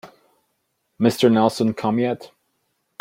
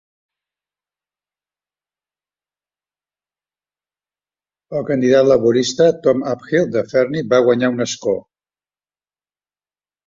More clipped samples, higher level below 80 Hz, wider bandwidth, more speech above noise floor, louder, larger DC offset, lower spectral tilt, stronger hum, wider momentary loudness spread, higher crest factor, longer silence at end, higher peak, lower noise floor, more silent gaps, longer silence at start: neither; about the same, -64 dBFS vs -60 dBFS; first, 16.5 kHz vs 7.8 kHz; second, 53 dB vs over 75 dB; second, -20 LUFS vs -16 LUFS; neither; about the same, -6 dB/octave vs -5.5 dB/octave; second, none vs 50 Hz at -60 dBFS; about the same, 8 LU vs 9 LU; about the same, 18 dB vs 18 dB; second, 0.75 s vs 1.85 s; about the same, -4 dBFS vs -2 dBFS; second, -72 dBFS vs under -90 dBFS; neither; second, 0.05 s vs 4.7 s